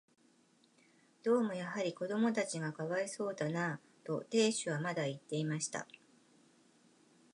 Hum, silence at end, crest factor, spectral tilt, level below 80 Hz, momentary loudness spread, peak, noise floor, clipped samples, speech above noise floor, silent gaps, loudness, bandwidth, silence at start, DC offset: none; 1.5 s; 20 dB; -4.5 dB/octave; -88 dBFS; 9 LU; -18 dBFS; -70 dBFS; under 0.1%; 34 dB; none; -37 LUFS; 11 kHz; 1.25 s; under 0.1%